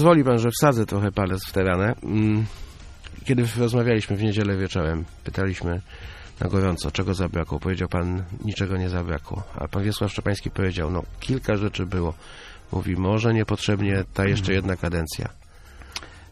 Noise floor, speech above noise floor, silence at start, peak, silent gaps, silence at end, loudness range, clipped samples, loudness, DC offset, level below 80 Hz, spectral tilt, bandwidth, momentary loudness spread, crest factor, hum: -44 dBFS; 21 dB; 0 s; -2 dBFS; none; 0.05 s; 3 LU; under 0.1%; -24 LUFS; under 0.1%; -40 dBFS; -6.5 dB/octave; 14.5 kHz; 13 LU; 22 dB; none